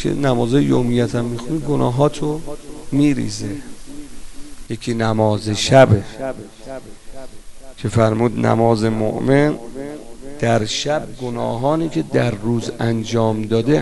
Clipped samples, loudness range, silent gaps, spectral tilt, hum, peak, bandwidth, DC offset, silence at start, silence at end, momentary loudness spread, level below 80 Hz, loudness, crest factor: under 0.1%; 3 LU; none; -6 dB/octave; none; 0 dBFS; 11.5 kHz; under 0.1%; 0 s; 0 s; 19 LU; -38 dBFS; -18 LUFS; 18 dB